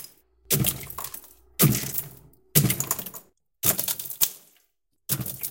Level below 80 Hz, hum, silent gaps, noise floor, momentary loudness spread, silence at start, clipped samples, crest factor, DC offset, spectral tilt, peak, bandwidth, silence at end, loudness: -52 dBFS; none; none; -72 dBFS; 19 LU; 0 s; under 0.1%; 26 dB; under 0.1%; -3.5 dB/octave; -2 dBFS; 17.5 kHz; 0 s; -24 LUFS